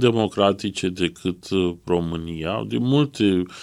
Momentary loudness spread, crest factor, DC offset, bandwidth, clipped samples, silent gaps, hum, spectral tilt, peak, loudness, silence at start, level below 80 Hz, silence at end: 7 LU; 18 dB; under 0.1%; 12.5 kHz; under 0.1%; none; none; -6 dB/octave; -2 dBFS; -22 LUFS; 0 s; -50 dBFS; 0 s